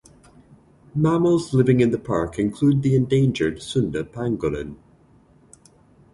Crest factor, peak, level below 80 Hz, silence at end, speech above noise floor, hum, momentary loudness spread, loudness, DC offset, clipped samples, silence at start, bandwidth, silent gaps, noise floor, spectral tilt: 18 dB; -4 dBFS; -48 dBFS; 1.4 s; 34 dB; none; 9 LU; -21 LUFS; under 0.1%; under 0.1%; 0.95 s; 11.5 kHz; none; -54 dBFS; -7.5 dB/octave